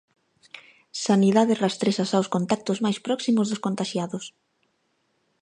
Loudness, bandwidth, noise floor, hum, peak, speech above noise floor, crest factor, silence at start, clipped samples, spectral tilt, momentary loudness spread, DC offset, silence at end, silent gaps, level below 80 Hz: -24 LUFS; 10.5 kHz; -71 dBFS; none; -6 dBFS; 48 dB; 18 dB; 0.55 s; under 0.1%; -5.5 dB/octave; 18 LU; under 0.1%; 1.1 s; none; -72 dBFS